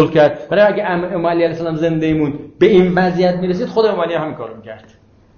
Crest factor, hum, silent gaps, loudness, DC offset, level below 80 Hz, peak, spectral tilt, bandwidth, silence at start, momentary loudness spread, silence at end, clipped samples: 14 dB; none; none; -15 LUFS; under 0.1%; -46 dBFS; -2 dBFS; -8 dB/octave; 6.8 kHz; 0 s; 11 LU; 0.6 s; under 0.1%